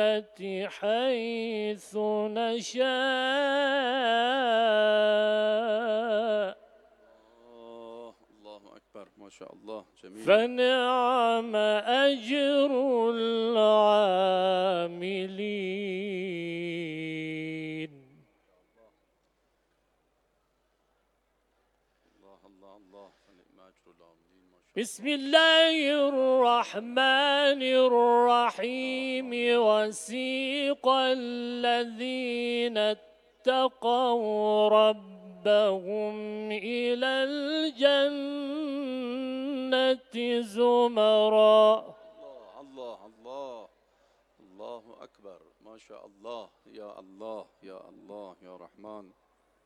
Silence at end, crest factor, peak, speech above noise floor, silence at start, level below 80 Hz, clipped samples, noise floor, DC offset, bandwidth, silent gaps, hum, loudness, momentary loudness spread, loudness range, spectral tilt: 0.65 s; 22 dB; -6 dBFS; 47 dB; 0 s; -78 dBFS; under 0.1%; -73 dBFS; under 0.1%; 12 kHz; none; none; -26 LUFS; 21 LU; 21 LU; -4 dB/octave